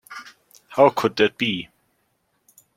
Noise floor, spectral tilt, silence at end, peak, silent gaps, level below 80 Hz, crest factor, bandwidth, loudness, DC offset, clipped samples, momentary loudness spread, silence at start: -69 dBFS; -5 dB/octave; 1.15 s; -2 dBFS; none; -64 dBFS; 22 dB; 16.5 kHz; -20 LUFS; under 0.1%; under 0.1%; 22 LU; 0.1 s